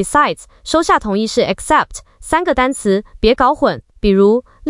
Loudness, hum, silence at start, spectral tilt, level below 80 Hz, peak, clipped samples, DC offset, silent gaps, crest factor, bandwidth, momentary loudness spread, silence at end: -15 LUFS; none; 0 s; -4.5 dB/octave; -34 dBFS; -2 dBFS; under 0.1%; under 0.1%; none; 14 dB; 12 kHz; 6 LU; 0 s